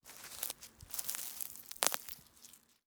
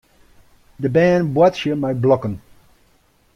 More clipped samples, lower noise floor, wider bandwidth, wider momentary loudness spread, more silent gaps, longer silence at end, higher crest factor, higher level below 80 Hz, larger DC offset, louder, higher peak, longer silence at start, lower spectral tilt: neither; first, -61 dBFS vs -57 dBFS; first, over 20 kHz vs 10 kHz; first, 20 LU vs 11 LU; neither; second, 0.3 s vs 1 s; first, 40 dB vs 18 dB; second, -72 dBFS vs -52 dBFS; neither; second, -39 LUFS vs -17 LUFS; about the same, -4 dBFS vs -2 dBFS; second, 0.05 s vs 0.8 s; second, 0.5 dB/octave vs -7.5 dB/octave